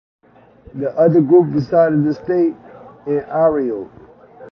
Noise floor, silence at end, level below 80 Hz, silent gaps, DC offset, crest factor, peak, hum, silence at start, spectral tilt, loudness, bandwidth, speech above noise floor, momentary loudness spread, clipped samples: -45 dBFS; 0.05 s; -54 dBFS; none; under 0.1%; 16 dB; -2 dBFS; none; 0.75 s; -10.5 dB/octave; -16 LUFS; 6 kHz; 30 dB; 19 LU; under 0.1%